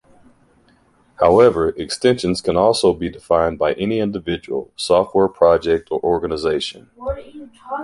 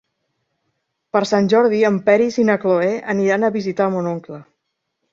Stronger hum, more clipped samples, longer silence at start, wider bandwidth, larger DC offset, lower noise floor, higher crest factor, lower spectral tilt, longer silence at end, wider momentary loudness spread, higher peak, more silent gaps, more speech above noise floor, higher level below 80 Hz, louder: neither; neither; about the same, 1.2 s vs 1.15 s; first, 11.5 kHz vs 7.8 kHz; neither; second, -56 dBFS vs -75 dBFS; about the same, 18 dB vs 16 dB; about the same, -5.5 dB/octave vs -6.5 dB/octave; second, 0 s vs 0.7 s; first, 13 LU vs 10 LU; about the same, 0 dBFS vs -2 dBFS; neither; second, 38 dB vs 58 dB; first, -42 dBFS vs -64 dBFS; about the same, -18 LUFS vs -17 LUFS